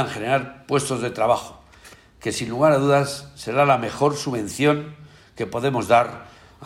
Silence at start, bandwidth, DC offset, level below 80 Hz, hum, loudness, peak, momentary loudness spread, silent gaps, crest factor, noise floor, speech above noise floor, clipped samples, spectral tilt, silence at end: 0 s; 16 kHz; under 0.1%; -56 dBFS; none; -21 LUFS; -4 dBFS; 12 LU; none; 18 dB; -48 dBFS; 27 dB; under 0.1%; -5 dB/octave; 0 s